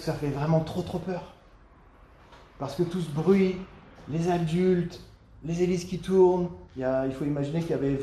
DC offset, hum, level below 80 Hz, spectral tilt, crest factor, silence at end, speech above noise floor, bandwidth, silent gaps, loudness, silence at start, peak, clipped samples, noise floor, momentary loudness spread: under 0.1%; none; -52 dBFS; -7.5 dB/octave; 16 dB; 0 s; 28 dB; 13 kHz; none; -27 LUFS; 0 s; -10 dBFS; under 0.1%; -54 dBFS; 14 LU